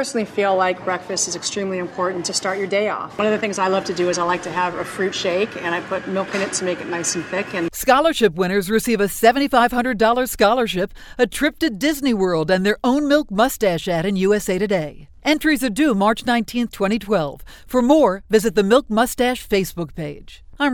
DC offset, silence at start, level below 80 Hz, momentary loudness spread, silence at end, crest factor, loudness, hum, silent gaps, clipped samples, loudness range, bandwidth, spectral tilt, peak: under 0.1%; 0 s; -44 dBFS; 8 LU; 0 s; 18 dB; -19 LUFS; none; none; under 0.1%; 4 LU; 19.5 kHz; -4 dB/octave; -2 dBFS